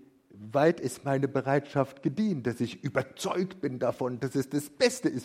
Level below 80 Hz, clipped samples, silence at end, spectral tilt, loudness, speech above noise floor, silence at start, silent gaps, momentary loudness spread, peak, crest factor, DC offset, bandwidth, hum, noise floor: -68 dBFS; under 0.1%; 0 s; -5.5 dB/octave; -30 LUFS; 20 dB; 0.35 s; none; 7 LU; -10 dBFS; 20 dB; under 0.1%; 16 kHz; none; -49 dBFS